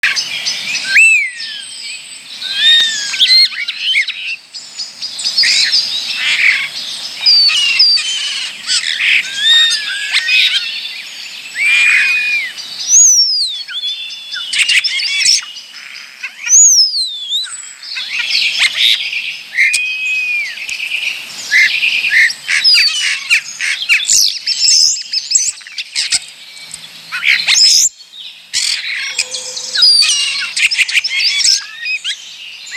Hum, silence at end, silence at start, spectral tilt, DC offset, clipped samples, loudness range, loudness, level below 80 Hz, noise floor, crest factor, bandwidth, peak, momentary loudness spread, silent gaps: none; 0 s; 0.05 s; 5 dB/octave; under 0.1%; under 0.1%; 3 LU; -10 LUFS; -64 dBFS; -33 dBFS; 14 dB; over 20 kHz; 0 dBFS; 17 LU; none